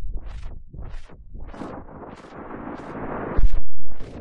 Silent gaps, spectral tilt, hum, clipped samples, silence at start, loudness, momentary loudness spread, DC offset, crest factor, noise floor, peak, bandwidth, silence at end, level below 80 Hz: none; -8 dB/octave; none; under 0.1%; 0 s; -34 LUFS; 16 LU; under 0.1%; 10 dB; -40 dBFS; -6 dBFS; 3.9 kHz; 0 s; -30 dBFS